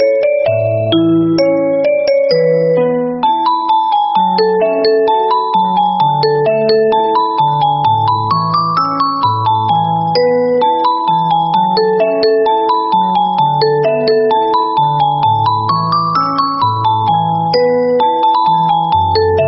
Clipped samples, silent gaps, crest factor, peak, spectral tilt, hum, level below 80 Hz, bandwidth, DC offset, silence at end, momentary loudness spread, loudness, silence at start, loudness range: under 0.1%; none; 10 dB; -2 dBFS; -4.5 dB/octave; none; -50 dBFS; 6 kHz; under 0.1%; 0 s; 2 LU; -12 LUFS; 0 s; 1 LU